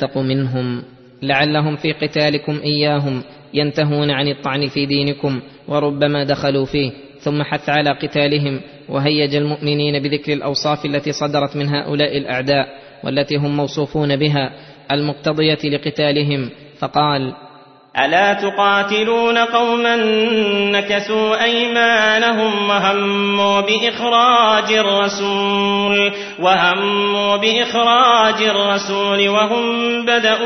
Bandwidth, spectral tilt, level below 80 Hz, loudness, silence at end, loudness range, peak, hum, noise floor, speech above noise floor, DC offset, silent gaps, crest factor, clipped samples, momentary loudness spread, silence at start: 6.4 kHz; -5 dB/octave; -54 dBFS; -16 LUFS; 0 s; 5 LU; 0 dBFS; none; -43 dBFS; 27 dB; under 0.1%; none; 16 dB; under 0.1%; 8 LU; 0 s